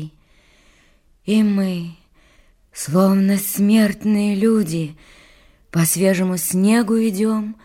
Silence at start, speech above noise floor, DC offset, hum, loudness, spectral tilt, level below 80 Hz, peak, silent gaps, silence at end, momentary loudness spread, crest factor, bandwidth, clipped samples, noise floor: 0 s; 38 dB; under 0.1%; none; -18 LUFS; -5.5 dB/octave; -54 dBFS; -4 dBFS; none; 0.1 s; 14 LU; 14 dB; 16.5 kHz; under 0.1%; -55 dBFS